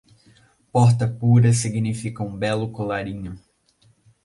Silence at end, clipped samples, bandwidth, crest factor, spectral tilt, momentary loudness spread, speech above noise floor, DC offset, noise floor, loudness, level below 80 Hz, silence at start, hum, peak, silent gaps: 0.85 s; under 0.1%; 11.5 kHz; 16 dB; -6.5 dB/octave; 13 LU; 40 dB; under 0.1%; -60 dBFS; -21 LUFS; -52 dBFS; 0.75 s; none; -6 dBFS; none